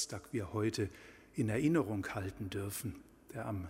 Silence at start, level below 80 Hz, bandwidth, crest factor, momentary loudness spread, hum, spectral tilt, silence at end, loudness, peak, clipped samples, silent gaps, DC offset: 0 s; -62 dBFS; 16 kHz; 18 dB; 14 LU; none; -5.5 dB/octave; 0 s; -38 LUFS; -20 dBFS; under 0.1%; none; under 0.1%